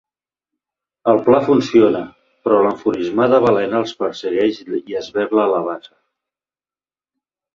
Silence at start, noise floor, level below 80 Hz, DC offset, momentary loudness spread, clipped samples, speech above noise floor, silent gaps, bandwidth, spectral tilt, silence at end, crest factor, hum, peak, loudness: 1.05 s; under -90 dBFS; -60 dBFS; under 0.1%; 11 LU; under 0.1%; over 74 dB; none; 7.4 kHz; -6.5 dB/octave; 1.75 s; 16 dB; none; -2 dBFS; -17 LUFS